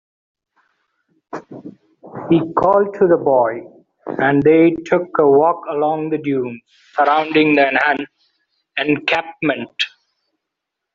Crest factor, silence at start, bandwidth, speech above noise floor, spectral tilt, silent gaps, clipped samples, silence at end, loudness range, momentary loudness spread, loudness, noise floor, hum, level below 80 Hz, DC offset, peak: 16 dB; 1.35 s; 7.4 kHz; 65 dB; -4 dB/octave; none; under 0.1%; 1.05 s; 4 LU; 20 LU; -16 LUFS; -80 dBFS; none; -58 dBFS; under 0.1%; -2 dBFS